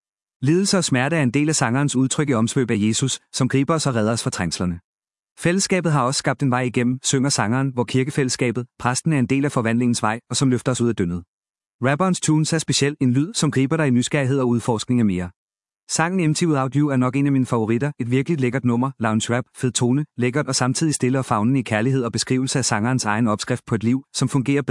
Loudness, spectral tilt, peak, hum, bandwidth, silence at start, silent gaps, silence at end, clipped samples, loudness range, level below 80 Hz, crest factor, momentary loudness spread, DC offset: -20 LUFS; -5 dB/octave; -2 dBFS; none; 12 kHz; 0.4 s; 4.84-4.99 s, 5.19-5.23 s, 5.31-5.36 s, 11.28-11.41 s, 11.66-11.79 s, 15.36-15.48 s, 15.83-15.87 s; 0 s; under 0.1%; 2 LU; -58 dBFS; 18 dB; 4 LU; under 0.1%